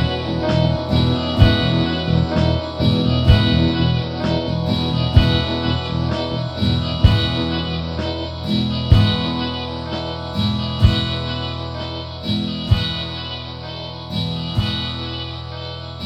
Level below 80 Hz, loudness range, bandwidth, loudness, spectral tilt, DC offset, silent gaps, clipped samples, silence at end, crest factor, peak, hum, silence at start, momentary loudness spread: -28 dBFS; 6 LU; 9.4 kHz; -19 LUFS; -7.5 dB/octave; under 0.1%; none; under 0.1%; 0 s; 18 dB; 0 dBFS; none; 0 s; 12 LU